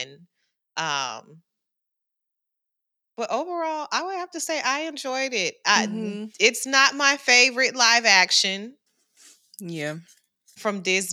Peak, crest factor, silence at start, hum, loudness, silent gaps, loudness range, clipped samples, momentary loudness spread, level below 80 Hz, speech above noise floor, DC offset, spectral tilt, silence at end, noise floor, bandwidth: -4 dBFS; 20 dB; 0 s; none; -21 LUFS; none; 14 LU; under 0.1%; 17 LU; under -90 dBFS; 60 dB; under 0.1%; -1 dB/octave; 0 s; -83 dBFS; 19.5 kHz